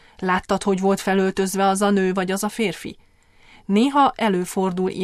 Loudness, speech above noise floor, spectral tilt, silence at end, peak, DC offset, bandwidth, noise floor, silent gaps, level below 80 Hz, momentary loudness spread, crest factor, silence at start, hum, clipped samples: -20 LUFS; 32 dB; -5 dB/octave; 0 s; -6 dBFS; under 0.1%; 14.5 kHz; -52 dBFS; none; -52 dBFS; 7 LU; 16 dB; 0.2 s; none; under 0.1%